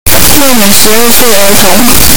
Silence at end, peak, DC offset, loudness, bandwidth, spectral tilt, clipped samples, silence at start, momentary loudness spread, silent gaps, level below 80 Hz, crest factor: 0 s; 0 dBFS; 60%; -3 LUFS; over 20 kHz; -2 dB/octave; 50%; 0.05 s; 1 LU; none; -20 dBFS; 8 dB